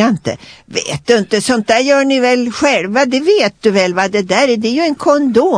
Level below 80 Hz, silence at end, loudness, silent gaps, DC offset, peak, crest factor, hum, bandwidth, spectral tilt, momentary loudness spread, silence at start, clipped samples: -52 dBFS; 0 s; -13 LUFS; none; under 0.1%; 0 dBFS; 12 dB; none; 10.5 kHz; -4 dB/octave; 8 LU; 0 s; under 0.1%